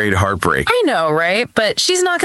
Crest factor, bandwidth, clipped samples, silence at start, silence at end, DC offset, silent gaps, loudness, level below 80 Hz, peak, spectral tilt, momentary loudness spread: 14 dB; 16 kHz; under 0.1%; 0 s; 0 s; under 0.1%; none; -15 LUFS; -42 dBFS; 0 dBFS; -3.5 dB/octave; 2 LU